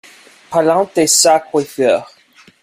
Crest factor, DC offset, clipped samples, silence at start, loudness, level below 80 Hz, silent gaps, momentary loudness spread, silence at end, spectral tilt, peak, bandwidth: 16 dB; under 0.1%; under 0.1%; 0.5 s; -13 LUFS; -58 dBFS; none; 9 LU; 0.6 s; -2.5 dB/octave; 0 dBFS; 16 kHz